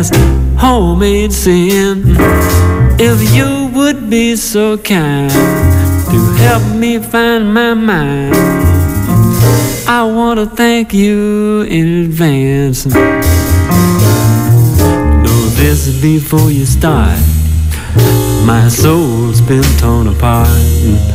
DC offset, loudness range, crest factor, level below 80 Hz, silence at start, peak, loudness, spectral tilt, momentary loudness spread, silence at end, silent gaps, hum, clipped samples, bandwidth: under 0.1%; 1 LU; 8 dB; -16 dBFS; 0 s; 0 dBFS; -10 LUFS; -6 dB/octave; 3 LU; 0 s; none; none; under 0.1%; 16.5 kHz